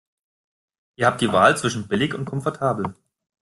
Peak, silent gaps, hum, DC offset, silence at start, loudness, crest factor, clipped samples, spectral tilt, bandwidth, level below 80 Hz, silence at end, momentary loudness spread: -2 dBFS; none; none; under 0.1%; 1 s; -21 LUFS; 22 dB; under 0.1%; -5 dB/octave; 12.5 kHz; -58 dBFS; 0.5 s; 10 LU